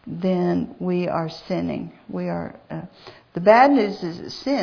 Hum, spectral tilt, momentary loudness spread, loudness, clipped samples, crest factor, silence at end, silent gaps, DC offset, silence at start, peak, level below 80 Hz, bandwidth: none; -7.5 dB/octave; 20 LU; -21 LUFS; under 0.1%; 20 dB; 0 s; none; under 0.1%; 0.05 s; -2 dBFS; -58 dBFS; 5.4 kHz